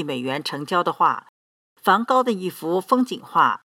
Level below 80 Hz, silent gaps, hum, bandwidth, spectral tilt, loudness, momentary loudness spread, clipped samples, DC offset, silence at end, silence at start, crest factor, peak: -84 dBFS; 1.29-1.76 s; none; 17 kHz; -5 dB/octave; -21 LUFS; 8 LU; under 0.1%; under 0.1%; 0.15 s; 0 s; 20 dB; -2 dBFS